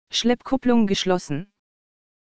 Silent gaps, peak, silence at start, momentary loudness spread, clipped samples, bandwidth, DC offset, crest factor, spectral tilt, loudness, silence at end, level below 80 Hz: none; -6 dBFS; 0.05 s; 10 LU; under 0.1%; 9.4 kHz; under 0.1%; 16 dB; -4.5 dB/octave; -22 LUFS; 0.65 s; -50 dBFS